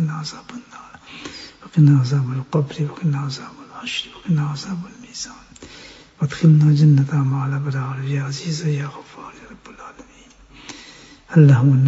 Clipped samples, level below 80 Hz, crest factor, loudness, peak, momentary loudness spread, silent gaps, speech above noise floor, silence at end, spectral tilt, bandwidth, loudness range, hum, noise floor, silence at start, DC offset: under 0.1%; -56 dBFS; 18 dB; -18 LUFS; -2 dBFS; 25 LU; none; 30 dB; 0 s; -7.5 dB/octave; 8 kHz; 9 LU; none; -47 dBFS; 0 s; under 0.1%